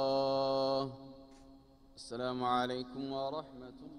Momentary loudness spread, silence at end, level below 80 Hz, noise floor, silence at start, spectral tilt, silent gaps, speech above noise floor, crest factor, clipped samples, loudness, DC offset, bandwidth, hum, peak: 20 LU; 0 s; -66 dBFS; -60 dBFS; 0 s; -5.5 dB/octave; none; 22 dB; 18 dB; under 0.1%; -36 LUFS; under 0.1%; 10.5 kHz; none; -18 dBFS